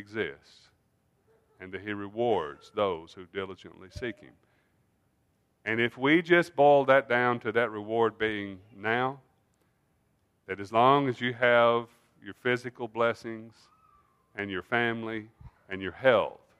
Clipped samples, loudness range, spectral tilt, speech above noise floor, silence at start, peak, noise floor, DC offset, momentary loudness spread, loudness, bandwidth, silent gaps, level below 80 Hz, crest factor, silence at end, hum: under 0.1%; 9 LU; -6.5 dB/octave; 44 dB; 0 s; -6 dBFS; -72 dBFS; under 0.1%; 19 LU; -27 LUFS; 12 kHz; none; -66 dBFS; 22 dB; 0.3 s; none